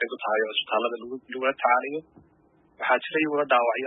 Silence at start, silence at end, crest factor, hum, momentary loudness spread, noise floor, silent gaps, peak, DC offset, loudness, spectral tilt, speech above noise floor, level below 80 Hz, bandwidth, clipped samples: 0 s; 0 s; 18 dB; none; 12 LU; -61 dBFS; none; -10 dBFS; under 0.1%; -25 LUFS; -7.5 dB/octave; 36 dB; -76 dBFS; 4 kHz; under 0.1%